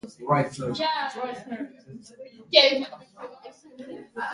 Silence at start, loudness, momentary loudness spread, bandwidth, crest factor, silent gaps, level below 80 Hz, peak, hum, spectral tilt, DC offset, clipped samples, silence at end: 0.05 s; -23 LUFS; 26 LU; 11 kHz; 26 dB; none; -68 dBFS; -2 dBFS; none; -4.5 dB/octave; under 0.1%; under 0.1%; 0 s